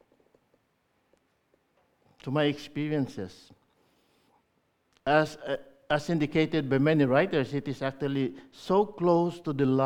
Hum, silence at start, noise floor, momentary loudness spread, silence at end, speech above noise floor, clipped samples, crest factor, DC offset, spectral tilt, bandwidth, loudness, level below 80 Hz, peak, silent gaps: none; 2.25 s; -73 dBFS; 12 LU; 0 s; 46 dB; under 0.1%; 20 dB; under 0.1%; -7 dB/octave; 12 kHz; -28 LUFS; -62 dBFS; -8 dBFS; none